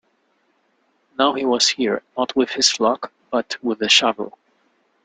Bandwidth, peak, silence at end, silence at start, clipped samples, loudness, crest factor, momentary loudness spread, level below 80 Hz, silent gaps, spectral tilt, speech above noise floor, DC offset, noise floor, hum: 9.6 kHz; 0 dBFS; 0.75 s; 1.2 s; under 0.1%; -19 LUFS; 20 dB; 12 LU; -66 dBFS; none; -1.5 dB/octave; 45 dB; under 0.1%; -65 dBFS; none